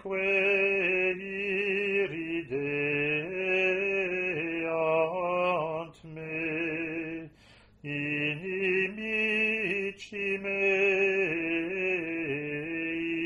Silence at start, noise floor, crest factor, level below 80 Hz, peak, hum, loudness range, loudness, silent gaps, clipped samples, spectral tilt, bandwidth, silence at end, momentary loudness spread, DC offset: 0 s; -58 dBFS; 16 dB; -64 dBFS; -14 dBFS; none; 5 LU; -29 LUFS; none; under 0.1%; -6 dB/octave; 10.5 kHz; 0 s; 9 LU; under 0.1%